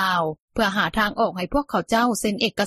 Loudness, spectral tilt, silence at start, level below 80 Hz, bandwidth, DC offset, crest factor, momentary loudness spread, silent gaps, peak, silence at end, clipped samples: -22 LUFS; -4 dB/octave; 0 s; -44 dBFS; 14.5 kHz; under 0.1%; 16 dB; 4 LU; 0.40-0.48 s; -6 dBFS; 0 s; under 0.1%